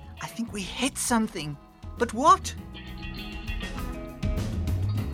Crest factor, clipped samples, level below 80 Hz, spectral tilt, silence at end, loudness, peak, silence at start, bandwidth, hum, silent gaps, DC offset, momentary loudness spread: 22 dB; under 0.1%; -38 dBFS; -4.5 dB/octave; 0 s; -28 LUFS; -8 dBFS; 0 s; 17 kHz; none; none; under 0.1%; 17 LU